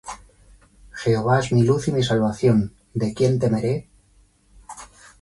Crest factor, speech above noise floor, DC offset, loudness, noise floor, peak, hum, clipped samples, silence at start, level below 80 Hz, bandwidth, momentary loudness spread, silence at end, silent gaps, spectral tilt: 16 dB; 38 dB; under 0.1%; -21 LUFS; -57 dBFS; -6 dBFS; none; under 0.1%; 0.05 s; -48 dBFS; 11.5 kHz; 21 LU; 0.35 s; none; -7 dB/octave